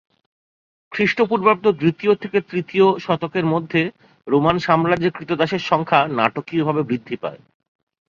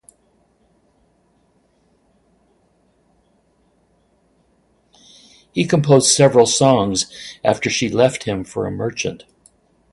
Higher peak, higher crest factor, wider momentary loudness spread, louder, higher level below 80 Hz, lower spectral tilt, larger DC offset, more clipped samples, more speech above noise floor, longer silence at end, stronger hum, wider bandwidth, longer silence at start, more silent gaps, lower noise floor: about the same, 0 dBFS vs 0 dBFS; about the same, 20 dB vs 20 dB; second, 7 LU vs 14 LU; second, -19 LUFS vs -16 LUFS; second, -58 dBFS vs -52 dBFS; first, -7 dB/octave vs -4 dB/octave; neither; neither; first, over 71 dB vs 44 dB; about the same, 0.7 s vs 0.75 s; neither; second, 7.2 kHz vs 11.5 kHz; second, 0.9 s vs 5.55 s; neither; first, under -90 dBFS vs -60 dBFS